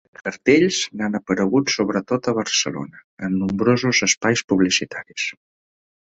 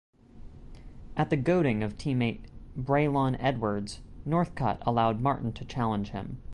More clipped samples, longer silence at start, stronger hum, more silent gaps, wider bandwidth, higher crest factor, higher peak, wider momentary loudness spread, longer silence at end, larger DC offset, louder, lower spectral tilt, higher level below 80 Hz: neither; about the same, 0.25 s vs 0.35 s; neither; first, 3.04-3.17 s, 4.17-4.21 s, 4.44-4.48 s vs none; second, 8.2 kHz vs 11 kHz; about the same, 18 dB vs 16 dB; first, -2 dBFS vs -12 dBFS; second, 10 LU vs 13 LU; first, 0.7 s vs 0 s; neither; first, -20 LUFS vs -29 LUFS; second, -3.5 dB/octave vs -7.5 dB/octave; second, -56 dBFS vs -48 dBFS